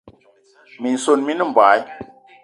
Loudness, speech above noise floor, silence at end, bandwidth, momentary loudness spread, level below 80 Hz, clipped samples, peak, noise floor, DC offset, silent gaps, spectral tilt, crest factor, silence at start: -17 LUFS; 37 dB; 0.4 s; 11 kHz; 18 LU; -64 dBFS; under 0.1%; 0 dBFS; -54 dBFS; under 0.1%; none; -3.5 dB/octave; 20 dB; 0.05 s